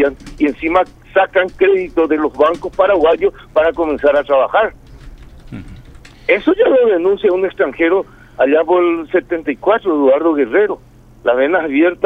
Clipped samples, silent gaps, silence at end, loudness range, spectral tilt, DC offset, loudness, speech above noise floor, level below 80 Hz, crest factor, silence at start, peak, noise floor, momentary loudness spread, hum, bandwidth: under 0.1%; none; 0 s; 2 LU; -6.5 dB/octave; under 0.1%; -14 LUFS; 24 dB; -42 dBFS; 14 dB; 0 s; 0 dBFS; -38 dBFS; 7 LU; none; 7.8 kHz